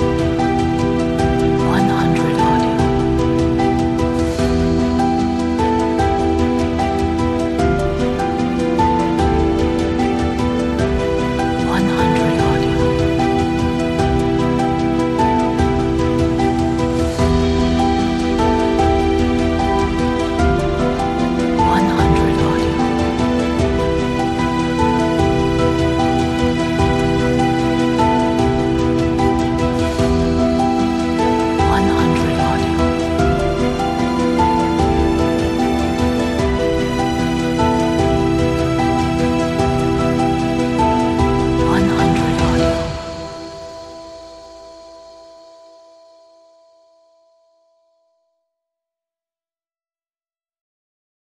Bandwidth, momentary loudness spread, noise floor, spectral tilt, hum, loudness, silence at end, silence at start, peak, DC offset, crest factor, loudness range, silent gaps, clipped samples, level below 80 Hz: 12.5 kHz; 3 LU; under -90 dBFS; -6.5 dB/octave; none; -16 LUFS; 6.05 s; 0 s; -2 dBFS; under 0.1%; 14 dB; 1 LU; none; under 0.1%; -28 dBFS